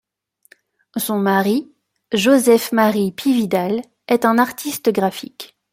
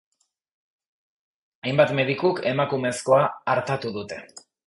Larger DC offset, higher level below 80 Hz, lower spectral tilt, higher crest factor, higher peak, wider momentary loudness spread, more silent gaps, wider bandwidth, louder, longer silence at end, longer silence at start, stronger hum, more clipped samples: neither; about the same, -62 dBFS vs -64 dBFS; about the same, -4.5 dB/octave vs -5.5 dB/octave; about the same, 16 dB vs 20 dB; about the same, -2 dBFS vs -4 dBFS; about the same, 11 LU vs 13 LU; neither; first, 16.5 kHz vs 11.5 kHz; first, -17 LUFS vs -23 LUFS; about the same, 0.25 s vs 0.3 s; second, 0.95 s vs 1.65 s; neither; neither